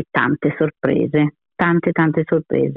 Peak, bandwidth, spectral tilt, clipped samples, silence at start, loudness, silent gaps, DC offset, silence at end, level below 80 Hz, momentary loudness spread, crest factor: -4 dBFS; 4.1 kHz; -10.5 dB/octave; under 0.1%; 0 s; -18 LUFS; none; under 0.1%; 0 s; -54 dBFS; 3 LU; 14 dB